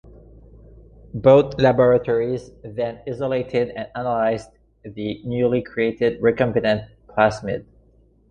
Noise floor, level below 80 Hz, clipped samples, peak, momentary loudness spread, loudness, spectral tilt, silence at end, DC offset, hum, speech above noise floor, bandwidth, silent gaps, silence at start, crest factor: -55 dBFS; -48 dBFS; under 0.1%; -2 dBFS; 15 LU; -21 LUFS; -7.5 dB/octave; 0.7 s; under 0.1%; none; 36 dB; 9.4 kHz; none; 0.05 s; 18 dB